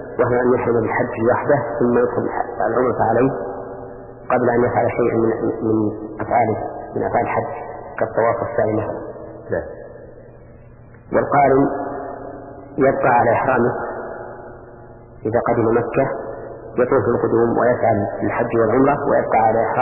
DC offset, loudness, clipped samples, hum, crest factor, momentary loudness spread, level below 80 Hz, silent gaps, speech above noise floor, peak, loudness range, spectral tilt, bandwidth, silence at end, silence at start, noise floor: under 0.1%; -19 LUFS; under 0.1%; none; 16 dB; 16 LU; -46 dBFS; none; 25 dB; -4 dBFS; 4 LU; -12.5 dB/octave; 2.9 kHz; 0 s; 0 s; -42 dBFS